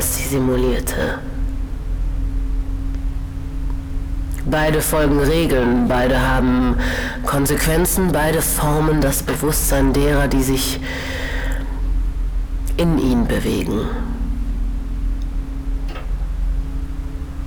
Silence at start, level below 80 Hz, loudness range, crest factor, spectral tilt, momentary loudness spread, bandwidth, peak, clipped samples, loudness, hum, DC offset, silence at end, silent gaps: 0 s; -22 dBFS; 8 LU; 12 dB; -5 dB/octave; 11 LU; over 20 kHz; -6 dBFS; under 0.1%; -20 LUFS; none; under 0.1%; 0 s; none